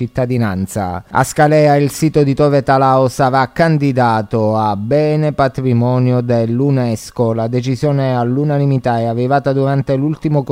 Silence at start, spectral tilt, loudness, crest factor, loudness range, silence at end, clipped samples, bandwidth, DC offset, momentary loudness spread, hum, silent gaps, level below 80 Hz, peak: 0 s; -7 dB/octave; -14 LUFS; 14 dB; 3 LU; 0 s; under 0.1%; 16 kHz; under 0.1%; 6 LU; none; none; -44 dBFS; 0 dBFS